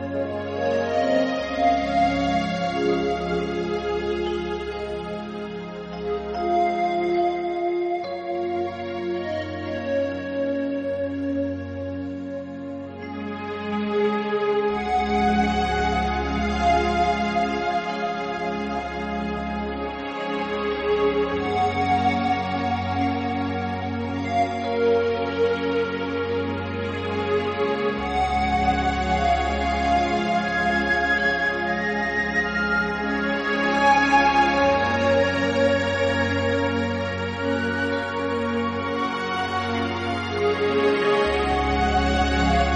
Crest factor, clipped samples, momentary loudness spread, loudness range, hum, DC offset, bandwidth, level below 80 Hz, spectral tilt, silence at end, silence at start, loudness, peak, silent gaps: 16 dB; under 0.1%; 9 LU; 7 LU; none; under 0.1%; 9.6 kHz; -38 dBFS; -6 dB/octave; 0 s; 0 s; -23 LUFS; -8 dBFS; none